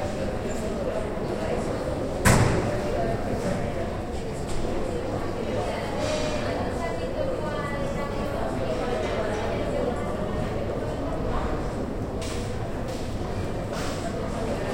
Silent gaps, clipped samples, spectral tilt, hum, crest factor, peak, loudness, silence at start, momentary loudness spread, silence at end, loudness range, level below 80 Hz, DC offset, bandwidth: none; under 0.1%; -5.5 dB/octave; none; 22 dB; -6 dBFS; -28 LUFS; 0 s; 4 LU; 0 s; 4 LU; -36 dBFS; under 0.1%; 16.5 kHz